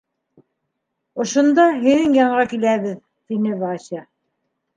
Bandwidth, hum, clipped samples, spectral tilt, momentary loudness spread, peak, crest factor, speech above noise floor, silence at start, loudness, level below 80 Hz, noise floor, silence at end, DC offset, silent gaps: 9.4 kHz; none; under 0.1%; -5 dB/octave; 18 LU; -2 dBFS; 18 dB; 59 dB; 1.15 s; -18 LUFS; -62 dBFS; -76 dBFS; 0.75 s; under 0.1%; none